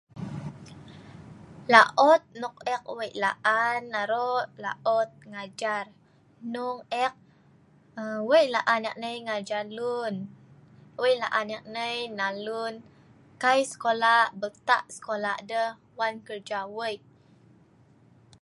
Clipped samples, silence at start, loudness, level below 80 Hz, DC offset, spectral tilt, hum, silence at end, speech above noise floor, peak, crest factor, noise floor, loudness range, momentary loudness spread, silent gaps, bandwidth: under 0.1%; 0.15 s; -26 LUFS; -70 dBFS; under 0.1%; -3.5 dB/octave; none; 1.45 s; 32 dB; -2 dBFS; 26 dB; -59 dBFS; 8 LU; 20 LU; none; 11.5 kHz